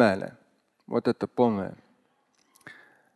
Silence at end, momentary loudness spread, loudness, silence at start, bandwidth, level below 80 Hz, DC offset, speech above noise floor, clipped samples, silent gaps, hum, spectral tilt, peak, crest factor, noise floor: 0.45 s; 24 LU; -28 LUFS; 0 s; 12 kHz; -64 dBFS; under 0.1%; 43 dB; under 0.1%; none; none; -7 dB/octave; -8 dBFS; 22 dB; -69 dBFS